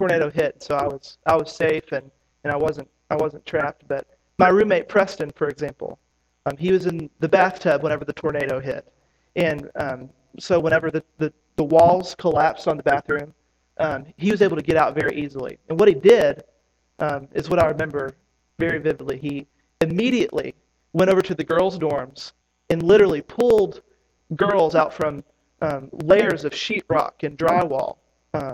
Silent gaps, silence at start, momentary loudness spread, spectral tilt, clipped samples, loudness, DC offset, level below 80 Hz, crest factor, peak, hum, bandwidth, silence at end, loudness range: none; 0 s; 14 LU; -6.5 dB/octave; under 0.1%; -21 LUFS; under 0.1%; -52 dBFS; 20 dB; 0 dBFS; none; 14 kHz; 0 s; 5 LU